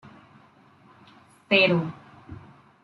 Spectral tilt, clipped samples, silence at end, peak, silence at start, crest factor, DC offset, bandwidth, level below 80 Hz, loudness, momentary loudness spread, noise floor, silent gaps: -7 dB/octave; under 0.1%; 0.5 s; -6 dBFS; 0.05 s; 22 dB; under 0.1%; 11 kHz; -64 dBFS; -22 LUFS; 27 LU; -56 dBFS; none